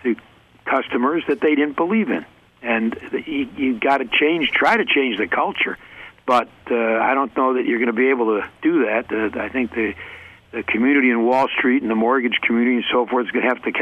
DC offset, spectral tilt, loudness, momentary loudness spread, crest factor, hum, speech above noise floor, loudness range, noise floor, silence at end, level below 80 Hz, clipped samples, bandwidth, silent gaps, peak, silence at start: under 0.1%; -6 dB/octave; -19 LUFS; 9 LU; 14 dB; none; 29 dB; 3 LU; -48 dBFS; 0 s; -58 dBFS; under 0.1%; 8.8 kHz; none; -4 dBFS; 0.05 s